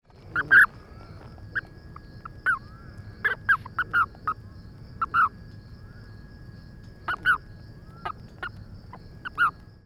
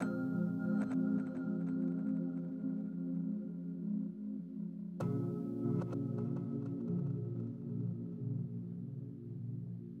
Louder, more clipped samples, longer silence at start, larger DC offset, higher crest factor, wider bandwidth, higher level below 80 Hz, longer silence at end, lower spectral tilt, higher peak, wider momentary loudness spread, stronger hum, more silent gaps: first, -24 LUFS vs -39 LUFS; neither; first, 0.25 s vs 0 s; neither; first, 22 dB vs 14 dB; first, 14 kHz vs 8.4 kHz; first, -50 dBFS vs -72 dBFS; first, 0.35 s vs 0 s; second, -4.5 dB/octave vs -10.5 dB/octave; first, -8 dBFS vs -24 dBFS; first, 23 LU vs 8 LU; neither; neither